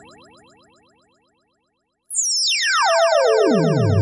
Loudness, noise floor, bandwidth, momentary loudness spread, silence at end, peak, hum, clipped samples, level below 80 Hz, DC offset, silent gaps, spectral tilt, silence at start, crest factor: -16 LUFS; -71 dBFS; 11.5 kHz; 4 LU; 0 s; -6 dBFS; none; under 0.1%; -62 dBFS; under 0.1%; none; -3.5 dB/octave; 2.1 s; 14 dB